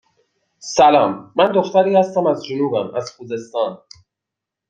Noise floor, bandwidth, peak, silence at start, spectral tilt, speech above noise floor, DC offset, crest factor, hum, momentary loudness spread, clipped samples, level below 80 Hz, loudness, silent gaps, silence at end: -84 dBFS; 7.8 kHz; -2 dBFS; 0.65 s; -5 dB/octave; 67 dB; under 0.1%; 16 dB; none; 14 LU; under 0.1%; -62 dBFS; -17 LUFS; none; 0.95 s